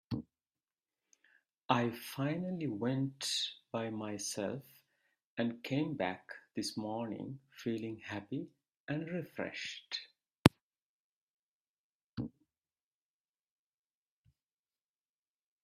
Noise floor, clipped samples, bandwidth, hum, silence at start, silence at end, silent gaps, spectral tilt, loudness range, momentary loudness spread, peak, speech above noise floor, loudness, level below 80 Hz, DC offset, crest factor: under -90 dBFS; under 0.1%; 15.5 kHz; none; 0.1 s; 3.35 s; 1.65-1.69 s, 5.25-5.37 s, 8.77-8.88 s, 10.39-10.45 s, 10.62-10.71 s, 10.82-12.17 s; -5 dB/octave; 16 LU; 13 LU; 0 dBFS; over 52 dB; -38 LUFS; -68 dBFS; under 0.1%; 40 dB